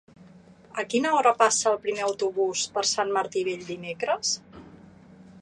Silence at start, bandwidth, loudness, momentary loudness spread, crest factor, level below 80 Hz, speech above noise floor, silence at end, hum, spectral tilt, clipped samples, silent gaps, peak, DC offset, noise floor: 0.2 s; 11.5 kHz; -25 LUFS; 11 LU; 22 dB; -68 dBFS; 26 dB; 0 s; none; -2 dB/octave; under 0.1%; none; -4 dBFS; under 0.1%; -51 dBFS